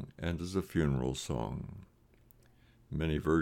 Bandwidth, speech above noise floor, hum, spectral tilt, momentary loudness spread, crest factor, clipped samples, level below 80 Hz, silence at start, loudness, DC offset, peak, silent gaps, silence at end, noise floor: 17 kHz; 31 dB; none; -6.5 dB/octave; 12 LU; 18 dB; under 0.1%; -50 dBFS; 0 s; -35 LUFS; under 0.1%; -16 dBFS; none; 0 s; -64 dBFS